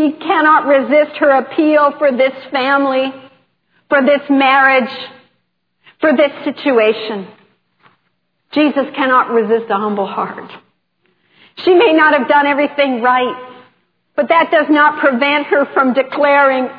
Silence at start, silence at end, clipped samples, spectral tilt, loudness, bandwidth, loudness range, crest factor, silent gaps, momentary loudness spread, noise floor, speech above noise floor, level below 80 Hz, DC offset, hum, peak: 0 s; 0 s; under 0.1%; -7.5 dB/octave; -13 LUFS; 5.2 kHz; 4 LU; 14 dB; none; 11 LU; -67 dBFS; 54 dB; -74 dBFS; under 0.1%; none; 0 dBFS